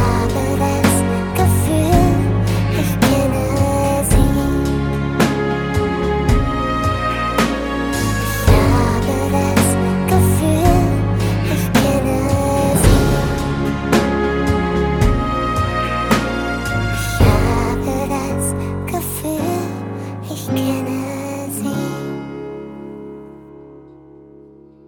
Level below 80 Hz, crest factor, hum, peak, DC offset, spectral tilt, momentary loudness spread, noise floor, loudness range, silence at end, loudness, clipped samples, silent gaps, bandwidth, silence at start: -26 dBFS; 16 dB; none; 0 dBFS; under 0.1%; -6 dB/octave; 9 LU; -43 dBFS; 8 LU; 1 s; -17 LUFS; under 0.1%; none; 19.5 kHz; 0 s